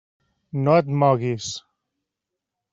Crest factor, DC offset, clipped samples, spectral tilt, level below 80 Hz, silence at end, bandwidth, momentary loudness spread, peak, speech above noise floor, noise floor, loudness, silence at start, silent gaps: 18 dB; under 0.1%; under 0.1%; -6.5 dB/octave; -64 dBFS; 1.15 s; 7.8 kHz; 14 LU; -4 dBFS; 64 dB; -84 dBFS; -21 LUFS; 0.55 s; none